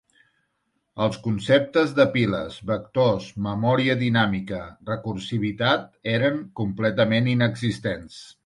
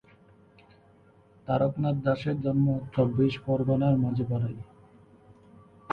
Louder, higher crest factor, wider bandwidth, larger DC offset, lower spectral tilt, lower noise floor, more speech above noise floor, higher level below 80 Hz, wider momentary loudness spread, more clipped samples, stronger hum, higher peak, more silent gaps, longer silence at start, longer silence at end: first, -23 LUFS vs -27 LUFS; about the same, 20 dB vs 16 dB; first, 11.5 kHz vs 5.4 kHz; neither; second, -7 dB/octave vs -10 dB/octave; first, -74 dBFS vs -58 dBFS; first, 51 dB vs 32 dB; about the same, -52 dBFS vs -56 dBFS; about the same, 10 LU vs 8 LU; neither; neither; first, -4 dBFS vs -12 dBFS; neither; second, 0.95 s vs 1.45 s; first, 0.15 s vs 0 s